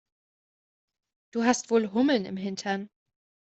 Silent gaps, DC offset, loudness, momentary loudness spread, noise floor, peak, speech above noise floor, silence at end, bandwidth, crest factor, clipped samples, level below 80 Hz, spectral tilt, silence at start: none; under 0.1%; -27 LUFS; 10 LU; under -90 dBFS; -8 dBFS; over 64 dB; 0.55 s; 8.2 kHz; 22 dB; under 0.1%; -72 dBFS; -4.5 dB/octave; 1.35 s